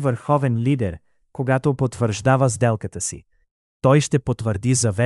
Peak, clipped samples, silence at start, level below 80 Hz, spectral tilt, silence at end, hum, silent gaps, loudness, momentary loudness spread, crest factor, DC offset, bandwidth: -2 dBFS; under 0.1%; 0 s; -48 dBFS; -6 dB/octave; 0 s; none; 3.51-3.80 s; -20 LUFS; 10 LU; 18 dB; under 0.1%; 12 kHz